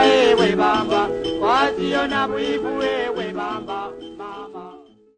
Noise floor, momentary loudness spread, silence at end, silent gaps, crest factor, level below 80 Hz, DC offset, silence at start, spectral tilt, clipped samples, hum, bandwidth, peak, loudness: -44 dBFS; 18 LU; 0.4 s; none; 18 dB; -50 dBFS; under 0.1%; 0 s; -4.5 dB/octave; under 0.1%; none; 9.6 kHz; -2 dBFS; -20 LUFS